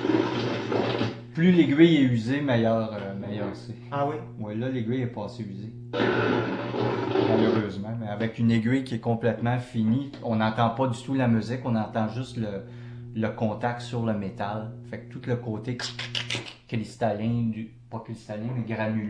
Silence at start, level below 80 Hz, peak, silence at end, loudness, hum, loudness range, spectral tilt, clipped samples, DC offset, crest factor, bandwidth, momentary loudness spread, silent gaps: 0 s; -58 dBFS; -4 dBFS; 0 s; -27 LUFS; none; 7 LU; -7 dB/octave; under 0.1%; under 0.1%; 22 dB; 10 kHz; 13 LU; none